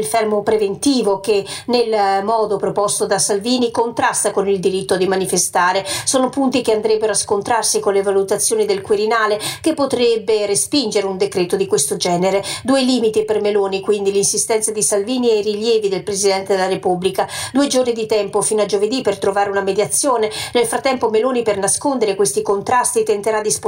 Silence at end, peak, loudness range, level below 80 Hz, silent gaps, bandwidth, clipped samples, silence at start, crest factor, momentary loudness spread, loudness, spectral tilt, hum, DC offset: 0 s; -4 dBFS; 1 LU; -56 dBFS; none; 16.5 kHz; under 0.1%; 0 s; 14 dB; 3 LU; -17 LUFS; -3 dB/octave; none; under 0.1%